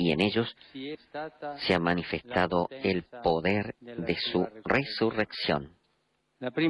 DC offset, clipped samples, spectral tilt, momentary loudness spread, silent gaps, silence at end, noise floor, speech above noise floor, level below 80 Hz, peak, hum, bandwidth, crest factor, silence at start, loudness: under 0.1%; under 0.1%; -7 dB/octave; 13 LU; none; 0 s; -74 dBFS; 45 dB; -54 dBFS; -12 dBFS; none; 11.5 kHz; 18 dB; 0 s; -29 LUFS